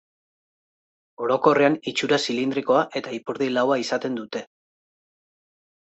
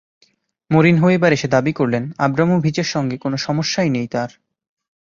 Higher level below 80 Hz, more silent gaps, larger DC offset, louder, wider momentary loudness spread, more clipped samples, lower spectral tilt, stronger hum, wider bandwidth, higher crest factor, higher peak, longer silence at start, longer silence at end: second, -70 dBFS vs -54 dBFS; neither; neither; second, -23 LUFS vs -17 LUFS; first, 12 LU vs 8 LU; neither; second, -4.5 dB/octave vs -6 dB/octave; neither; first, 8.2 kHz vs 7.4 kHz; about the same, 20 dB vs 16 dB; about the same, -4 dBFS vs -2 dBFS; first, 1.2 s vs 0.7 s; first, 1.45 s vs 0.8 s